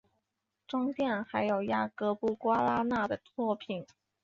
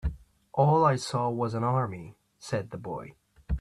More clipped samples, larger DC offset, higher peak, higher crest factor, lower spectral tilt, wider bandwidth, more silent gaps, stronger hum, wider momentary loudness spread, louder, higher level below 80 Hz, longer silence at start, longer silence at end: neither; neither; second, -16 dBFS vs -10 dBFS; about the same, 16 dB vs 18 dB; about the same, -7 dB/octave vs -7 dB/octave; second, 7.4 kHz vs 12 kHz; neither; neither; second, 7 LU vs 21 LU; second, -32 LUFS vs -28 LUFS; second, -68 dBFS vs -42 dBFS; first, 0.7 s vs 0.05 s; first, 0.4 s vs 0 s